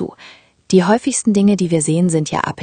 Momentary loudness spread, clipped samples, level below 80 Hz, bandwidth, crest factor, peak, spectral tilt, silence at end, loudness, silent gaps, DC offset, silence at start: 5 LU; under 0.1%; -54 dBFS; 10 kHz; 16 dB; 0 dBFS; -5.5 dB/octave; 0 s; -15 LUFS; none; under 0.1%; 0 s